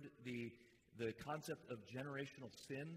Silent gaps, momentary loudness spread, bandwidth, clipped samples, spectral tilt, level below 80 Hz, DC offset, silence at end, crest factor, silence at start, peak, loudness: none; 8 LU; 15.5 kHz; under 0.1%; -5.5 dB/octave; -80 dBFS; under 0.1%; 0 s; 18 dB; 0 s; -34 dBFS; -50 LUFS